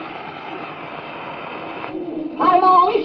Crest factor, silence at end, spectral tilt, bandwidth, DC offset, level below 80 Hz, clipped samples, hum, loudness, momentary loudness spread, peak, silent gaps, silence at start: 16 dB; 0 s; -7.5 dB/octave; 5.8 kHz; under 0.1%; -60 dBFS; under 0.1%; none; -18 LUFS; 18 LU; -4 dBFS; none; 0 s